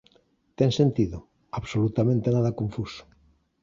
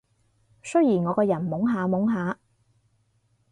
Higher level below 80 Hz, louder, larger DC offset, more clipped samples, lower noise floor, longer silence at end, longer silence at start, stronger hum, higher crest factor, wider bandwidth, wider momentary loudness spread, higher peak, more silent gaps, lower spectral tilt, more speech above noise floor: first, -50 dBFS vs -66 dBFS; about the same, -25 LUFS vs -24 LUFS; neither; neither; about the same, -64 dBFS vs -67 dBFS; second, 0.6 s vs 1.2 s; about the same, 0.6 s vs 0.65 s; neither; about the same, 18 dB vs 16 dB; second, 7.6 kHz vs 10.5 kHz; first, 15 LU vs 10 LU; about the same, -8 dBFS vs -10 dBFS; neither; about the same, -7.5 dB/octave vs -8 dB/octave; second, 40 dB vs 45 dB